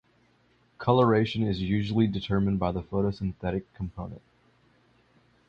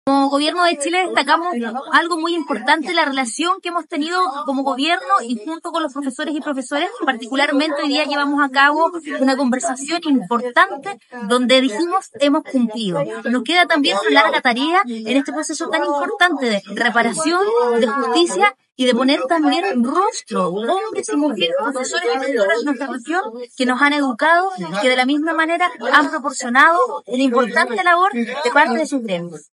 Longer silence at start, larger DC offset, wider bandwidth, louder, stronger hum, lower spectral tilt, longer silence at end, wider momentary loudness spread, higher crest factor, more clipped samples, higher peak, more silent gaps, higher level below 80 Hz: first, 0.8 s vs 0.05 s; neither; second, 7.2 kHz vs 11.5 kHz; second, -27 LUFS vs -17 LUFS; first, 60 Hz at -55 dBFS vs none; first, -8.5 dB/octave vs -3 dB/octave; first, 1.3 s vs 0.2 s; first, 14 LU vs 8 LU; about the same, 20 dB vs 18 dB; neither; second, -8 dBFS vs 0 dBFS; neither; first, -48 dBFS vs -74 dBFS